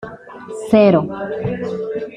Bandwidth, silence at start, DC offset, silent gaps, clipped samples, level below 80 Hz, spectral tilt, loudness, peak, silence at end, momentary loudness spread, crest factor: 11.5 kHz; 0 s; under 0.1%; none; under 0.1%; -52 dBFS; -7.5 dB/octave; -17 LUFS; 0 dBFS; 0 s; 21 LU; 16 dB